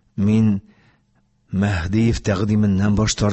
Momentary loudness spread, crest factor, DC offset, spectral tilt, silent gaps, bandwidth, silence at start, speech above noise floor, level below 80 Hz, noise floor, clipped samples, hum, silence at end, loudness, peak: 5 LU; 12 dB; under 0.1%; -6 dB/octave; none; 8.4 kHz; 0.15 s; 44 dB; -34 dBFS; -62 dBFS; under 0.1%; none; 0 s; -19 LUFS; -6 dBFS